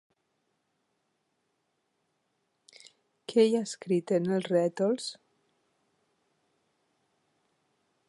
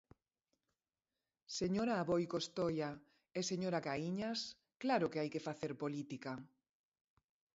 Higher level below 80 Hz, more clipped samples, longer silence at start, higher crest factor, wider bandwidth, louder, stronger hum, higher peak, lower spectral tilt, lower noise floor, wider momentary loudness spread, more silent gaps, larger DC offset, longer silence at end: second, -84 dBFS vs -74 dBFS; neither; first, 3.3 s vs 1.5 s; about the same, 22 dB vs 18 dB; first, 11.5 kHz vs 7.6 kHz; first, -28 LUFS vs -40 LUFS; neither; first, -12 dBFS vs -24 dBFS; first, -6 dB/octave vs -4.5 dB/octave; second, -78 dBFS vs under -90 dBFS; about the same, 9 LU vs 10 LU; neither; neither; first, 2.95 s vs 1.1 s